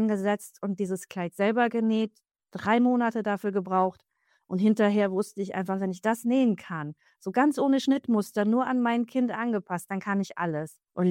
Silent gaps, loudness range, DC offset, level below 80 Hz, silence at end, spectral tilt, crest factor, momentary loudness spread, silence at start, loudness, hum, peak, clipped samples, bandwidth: none; 1 LU; under 0.1%; -76 dBFS; 0 s; -6.5 dB/octave; 14 dB; 11 LU; 0 s; -27 LUFS; none; -12 dBFS; under 0.1%; 16.5 kHz